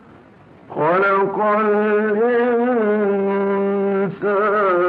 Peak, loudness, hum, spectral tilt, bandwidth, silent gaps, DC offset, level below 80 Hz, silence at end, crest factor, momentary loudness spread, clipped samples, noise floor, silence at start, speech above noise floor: -8 dBFS; -18 LUFS; none; -10 dB/octave; 4.6 kHz; none; under 0.1%; -64 dBFS; 0 s; 10 dB; 3 LU; under 0.1%; -45 dBFS; 0.7 s; 29 dB